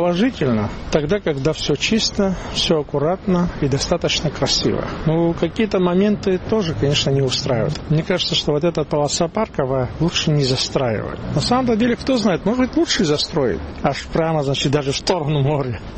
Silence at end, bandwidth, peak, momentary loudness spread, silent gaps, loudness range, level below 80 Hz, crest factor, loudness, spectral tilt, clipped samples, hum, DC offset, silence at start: 0 s; 8.8 kHz; -2 dBFS; 4 LU; none; 1 LU; -36 dBFS; 16 dB; -19 LUFS; -5 dB/octave; under 0.1%; none; 0.2%; 0 s